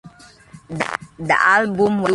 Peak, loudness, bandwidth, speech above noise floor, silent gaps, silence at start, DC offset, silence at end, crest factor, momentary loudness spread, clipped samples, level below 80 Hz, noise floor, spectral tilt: -2 dBFS; -18 LUFS; 11.5 kHz; 26 dB; none; 0.05 s; under 0.1%; 0 s; 18 dB; 13 LU; under 0.1%; -54 dBFS; -44 dBFS; -5.5 dB/octave